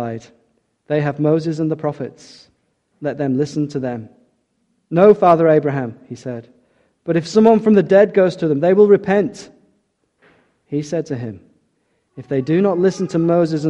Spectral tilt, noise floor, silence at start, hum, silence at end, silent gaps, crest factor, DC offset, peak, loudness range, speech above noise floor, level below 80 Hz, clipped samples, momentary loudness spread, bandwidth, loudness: -7.5 dB/octave; -66 dBFS; 0 s; none; 0 s; none; 18 dB; under 0.1%; 0 dBFS; 10 LU; 50 dB; -58 dBFS; under 0.1%; 18 LU; 8.8 kHz; -16 LUFS